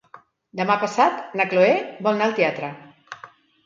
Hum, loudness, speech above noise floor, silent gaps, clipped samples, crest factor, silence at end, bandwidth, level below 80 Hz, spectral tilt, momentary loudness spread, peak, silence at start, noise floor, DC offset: none; -21 LUFS; 29 dB; none; under 0.1%; 18 dB; 0.4 s; 7.6 kHz; -74 dBFS; -5.5 dB/octave; 22 LU; -4 dBFS; 0.15 s; -50 dBFS; under 0.1%